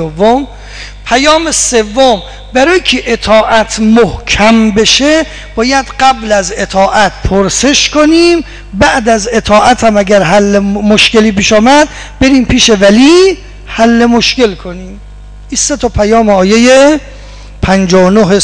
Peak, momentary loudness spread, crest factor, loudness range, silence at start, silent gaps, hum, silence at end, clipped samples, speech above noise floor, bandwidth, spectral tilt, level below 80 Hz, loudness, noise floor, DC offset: 0 dBFS; 9 LU; 8 dB; 3 LU; 0 s; none; 50 Hz at -30 dBFS; 0 s; under 0.1%; 20 dB; 10.5 kHz; -3.5 dB/octave; -26 dBFS; -7 LUFS; -27 dBFS; under 0.1%